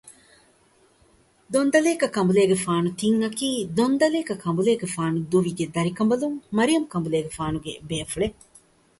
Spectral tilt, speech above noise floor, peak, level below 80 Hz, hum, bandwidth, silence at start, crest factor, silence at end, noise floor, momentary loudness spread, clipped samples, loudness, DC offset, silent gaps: -5.5 dB/octave; 37 dB; -4 dBFS; -54 dBFS; none; 12 kHz; 0.05 s; 18 dB; 0.7 s; -60 dBFS; 9 LU; under 0.1%; -23 LUFS; under 0.1%; none